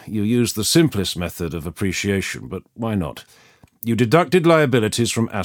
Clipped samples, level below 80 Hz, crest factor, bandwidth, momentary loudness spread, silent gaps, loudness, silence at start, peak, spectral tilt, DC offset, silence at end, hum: under 0.1%; -50 dBFS; 18 dB; 19.5 kHz; 13 LU; none; -19 LUFS; 0 s; -2 dBFS; -5 dB/octave; under 0.1%; 0 s; none